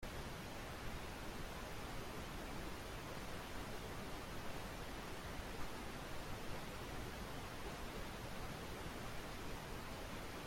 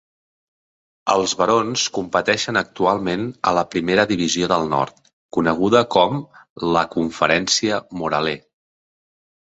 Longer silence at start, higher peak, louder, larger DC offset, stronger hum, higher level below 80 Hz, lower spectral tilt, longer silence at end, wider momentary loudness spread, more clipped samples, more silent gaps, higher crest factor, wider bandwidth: second, 0 s vs 1.05 s; second, -30 dBFS vs 0 dBFS; second, -49 LUFS vs -19 LUFS; neither; neither; about the same, -54 dBFS vs -52 dBFS; about the same, -4.5 dB/octave vs -3.5 dB/octave; second, 0 s vs 1.2 s; second, 1 LU vs 8 LU; neither; second, none vs 5.13-5.29 s, 6.50-6.56 s; about the same, 16 dB vs 20 dB; first, 16.5 kHz vs 8.2 kHz